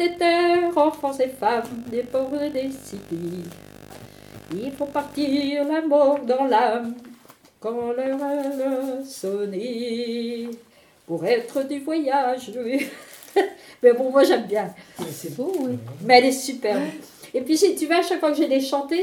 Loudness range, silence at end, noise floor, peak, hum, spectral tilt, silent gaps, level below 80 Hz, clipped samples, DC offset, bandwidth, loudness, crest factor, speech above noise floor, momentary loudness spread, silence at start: 7 LU; 0 s; -50 dBFS; 0 dBFS; none; -4.5 dB/octave; none; -64 dBFS; under 0.1%; under 0.1%; 18.5 kHz; -23 LUFS; 22 dB; 27 dB; 15 LU; 0 s